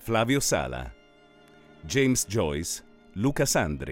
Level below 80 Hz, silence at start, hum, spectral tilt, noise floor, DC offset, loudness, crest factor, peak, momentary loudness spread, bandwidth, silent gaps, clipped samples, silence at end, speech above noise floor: -46 dBFS; 0 s; none; -4 dB/octave; -56 dBFS; under 0.1%; -26 LUFS; 18 dB; -10 dBFS; 15 LU; 17 kHz; none; under 0.1%; 0 s; 30 dB